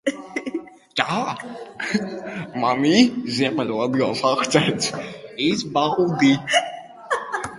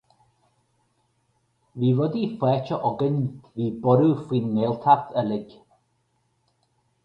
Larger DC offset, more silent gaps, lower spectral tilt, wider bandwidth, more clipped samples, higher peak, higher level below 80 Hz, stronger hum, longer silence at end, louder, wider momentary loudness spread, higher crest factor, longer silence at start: neither; neither; second, -4.5 dB/octave vs -10 dB/octave; first, 11.5 kHz vs 5.6 kHz; neither; about the same, -2 dBFS vs -4 dBFS; about the same, -60 dBFS vs -64 dBFS; neither; second, 0 s vs 1.6 s; about the same, -21 LUFS vs -23 LUFS; first, 14 LU vs 10 LU; about the same, 20 dB vs 22 dB; second, 0.05 s vs 1.75 s